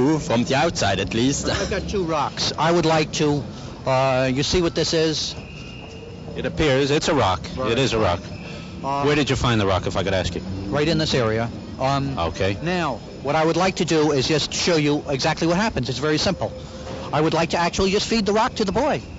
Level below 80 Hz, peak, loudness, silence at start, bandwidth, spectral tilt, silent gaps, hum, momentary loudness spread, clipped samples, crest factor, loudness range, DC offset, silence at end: -40 dBFS; -6 dBFS; -21 LUFS; 0 s; 8 kHz; -4.5 dB/octave; none; none; 10 LU; under 0.1%; 14 dB; 2 LU; under 0.1%; 0 s